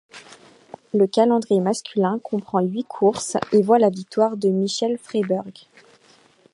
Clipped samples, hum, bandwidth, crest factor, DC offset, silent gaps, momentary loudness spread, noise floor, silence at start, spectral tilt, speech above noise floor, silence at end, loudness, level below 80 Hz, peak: under 0.1%; none; 11.5 kHz; 18 dB; under 0.1%; none; 8 LU; -55 dBFS; 0.15 s; -5.5 dB/octave; 35 dB; 1 s; -21 LUFS; -68 dBFS; -2 dBFS